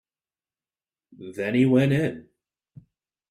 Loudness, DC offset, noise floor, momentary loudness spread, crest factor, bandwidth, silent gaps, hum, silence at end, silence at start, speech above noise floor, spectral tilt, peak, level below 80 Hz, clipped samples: -22 LUFS; under 0.1%; under -90 dBFS; 23 LU; 18 dB; 13.5 kHz; none; none; 1.1 s; 1.2 s; over 68 dB; -8 dB/octave; -8 dBFS; -62 dBFS; under 0.1%